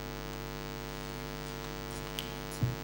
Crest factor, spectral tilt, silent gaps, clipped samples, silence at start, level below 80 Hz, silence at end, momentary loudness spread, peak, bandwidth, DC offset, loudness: 24 dB; -5 dB/octave; none; under 0.1%; 0 s; -48 dBFS; 0 s; 4 LU; -16 dBFS; over 20 kHz; under 0.1%; -39 LUFS